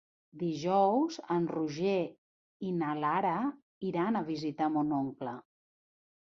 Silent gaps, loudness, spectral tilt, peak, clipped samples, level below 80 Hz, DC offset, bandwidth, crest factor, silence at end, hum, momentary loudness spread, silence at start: 2.18-2.60 s, 3.62-3.81 s; -32 LUFS; -7 dB/octave; -16 dBFS; under 0.1%; -76 dBFS; under 0.1%; 7.4 kHz; 18 dB; 1 s; none; 12 LU; 0.35 s